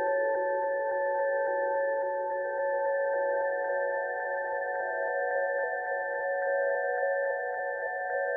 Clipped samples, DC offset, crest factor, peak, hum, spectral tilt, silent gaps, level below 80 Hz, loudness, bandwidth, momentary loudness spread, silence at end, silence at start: under 0.1%; under 0.1%; 12 dB; -18 dBFS; none; -7.5 dB/octave; none; -80 dBFS; -30 LUFS; 2.1 kHz; 3 LU; 0 s; 0 s